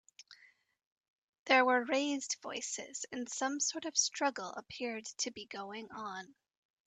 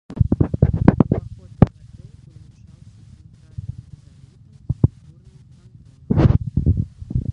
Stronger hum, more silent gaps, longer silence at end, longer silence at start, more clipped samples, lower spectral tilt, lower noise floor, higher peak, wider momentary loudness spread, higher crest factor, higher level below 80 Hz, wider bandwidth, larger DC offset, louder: neither; first, 0.86-1.33 s, 1.39-1.46 s vs none; first, 0.55 s vs 0 s; about the same, 0.2 s vs 0.1 s; neither; second, -0.5 dB/octave vs -11 dB/octave; first, -62 dBFS vs -46 dBFS; second, -16 dBFS vs 0 dBFS; second, 15 LU vs 19 LU; about the same, 22 dB vs 20 dB; second, -82 dBFS vs -30 dBFS; first, 9.4 kHz vs 6 kHz; neither; second, -35 LUFS vs -19 LUFS